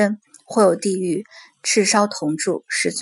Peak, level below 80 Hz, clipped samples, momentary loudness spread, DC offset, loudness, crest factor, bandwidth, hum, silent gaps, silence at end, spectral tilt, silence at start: 0 dBFS; -72 dBFS; under 0.1%; 10 LU; under 0.1%; -20 LUFS; 20 dB; 11.5 kHz; none; none; 0 s; -3.5 dB/octave; 0 s